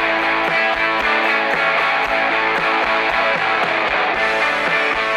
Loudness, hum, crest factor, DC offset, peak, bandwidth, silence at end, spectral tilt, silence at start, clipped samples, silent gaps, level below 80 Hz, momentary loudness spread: -16 LUFS; none; 14 dB; under 0.1%; -4 dBFS; 15 kHz; 0 s; -3 dB/octave; 0 s; under 0.1%; none; -48 dBFS; 1 LU